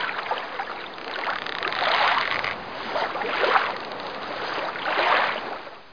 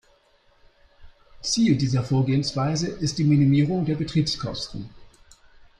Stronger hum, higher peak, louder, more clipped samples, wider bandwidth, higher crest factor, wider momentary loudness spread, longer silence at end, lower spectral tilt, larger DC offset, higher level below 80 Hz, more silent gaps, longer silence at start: neither; first, -2 dBFS vs -8 dBFS; about the same, -25 LUFS vs -23 LUFS; neither; second, 5.4 kHz vs 10.5 kHz; first, 24 dB vs 16 dB; about the same, 12 LU vs 13 LU; second, 0 s vs 0.75 s; second, -3.5 dB/octave vs -6 dB/octave; first, 0.3% vs under 0.1%; second, -64 dBFS vs -50 dBFS; neither; second, 0 s vs 1 s